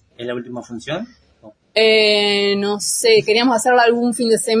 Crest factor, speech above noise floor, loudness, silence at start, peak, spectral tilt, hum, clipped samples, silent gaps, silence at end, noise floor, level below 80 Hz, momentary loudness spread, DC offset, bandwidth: 14 dB; 30 dB; -15 LUFS; 0.2 s; -2 dBFS; -2.5 dB/octave; none; under 0.1%; none; 0 s; -46 dBFS; -62 dBFS; 15 LU; under 0.1%; 11 kHz